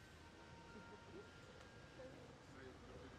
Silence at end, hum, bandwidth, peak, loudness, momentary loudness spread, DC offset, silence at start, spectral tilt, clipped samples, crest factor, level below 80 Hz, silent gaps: 0 s; none; 13 kHz; -44 dBFS; -60 LUFS; 2 LU; under 0.1%; 0 s; -5 dB/octave; under 0.1%; 16 dB; -72 dBFS; none